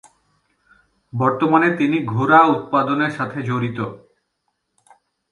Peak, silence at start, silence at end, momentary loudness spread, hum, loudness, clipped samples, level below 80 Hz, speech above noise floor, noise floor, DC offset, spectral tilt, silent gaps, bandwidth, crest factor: 0 dBFS; 1.15 s; 1.35 s; 12 LU; none; -18 LUFS; under 0.1%; -62 dBFS; 55 dB; -73 dBFS; under 0.1%; -8 dB/octave; none; 11 kHz; 20 dB